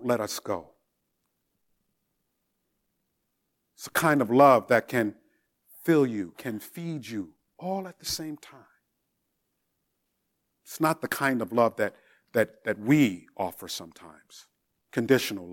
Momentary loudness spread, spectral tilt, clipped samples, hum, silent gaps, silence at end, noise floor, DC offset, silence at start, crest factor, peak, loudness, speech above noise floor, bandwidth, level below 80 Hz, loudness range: 15 LU; -5 dB/octave; under 0.1%; none; none; 0 s; -78 dBFS; under 0.1%; 0 s; 24 dB; -6 dBFS; -27 LUFS; 52 dB; 17.5 kHz; -70 dBFS; 13 LU